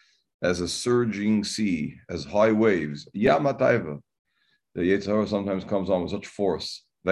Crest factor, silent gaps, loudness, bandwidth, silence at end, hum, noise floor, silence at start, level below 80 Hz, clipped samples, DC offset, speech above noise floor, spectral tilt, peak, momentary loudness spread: 20 dB; 4.19-4.25 s; -25 LUFS; 12 kHz; 0 s; none; -71 dBFS; 0.4 s; -52 dBFS; under 0.1%; under 0.1%; 46 dB; -5.5 dB/octave; -6 dBFS; 11 LU